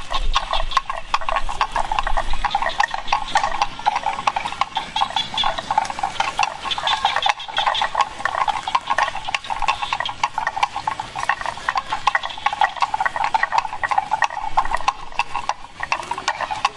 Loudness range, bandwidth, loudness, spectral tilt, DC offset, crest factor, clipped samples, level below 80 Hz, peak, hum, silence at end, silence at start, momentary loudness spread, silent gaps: 2 LU; 11.5 kHz; -22 LUFS; -1.5 dB/octave; under 0.1%; 20 dB; under 0.1%; -32 dBFS; -2 dBFS; none; 0 s; 0 s; 4 LU; none